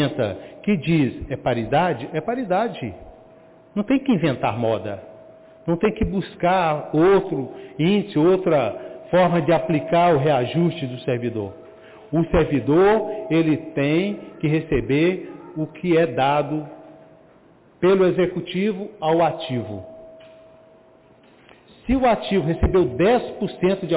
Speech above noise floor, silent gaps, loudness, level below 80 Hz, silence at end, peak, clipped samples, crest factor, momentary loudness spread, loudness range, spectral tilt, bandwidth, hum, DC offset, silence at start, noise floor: 32 dB; none; -21 LUFS; -40 dBFS; 0 s; -8 dBFS; under 0.1%; 12 dB; 11 LU; 5 LU; -11 dB/octave; 4 kHz; none; under 0.1%; 0 s; -52 dBFS